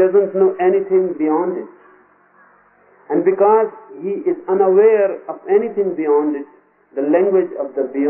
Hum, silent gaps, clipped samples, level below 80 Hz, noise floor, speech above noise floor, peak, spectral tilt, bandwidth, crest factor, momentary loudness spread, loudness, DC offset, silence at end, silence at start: none; none; under 0.1%; -76 dBFS; -52 dBFS; 36 dB; -2 dBFS; -3 dB/octave; 3 kHz; 14 dB; 14 LU; -16 LUFS; under 0.1%; 0 s; 0 s